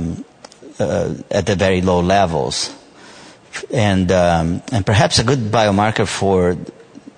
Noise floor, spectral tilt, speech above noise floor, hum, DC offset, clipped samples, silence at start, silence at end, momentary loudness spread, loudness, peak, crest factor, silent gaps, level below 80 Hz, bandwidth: -41 dBFS; -5 dB/octave; 25 dB; none; under 0.1%; under 0.1%; 0 s; 0.1 s; 11 LU; -16 LUFS; 0 dBFS; 18 dB; none; -40 dBFS; 9.6 kHz